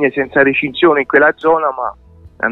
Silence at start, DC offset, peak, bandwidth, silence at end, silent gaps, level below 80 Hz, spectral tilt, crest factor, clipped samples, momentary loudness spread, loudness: 0 s; under 0.1%; 0 dBFS; 4.2 kHz; 0 s; none; -48 dBFS; -7.5 dB/octave; 14 dB; under 0.1%; 10 LU; -13 LUFS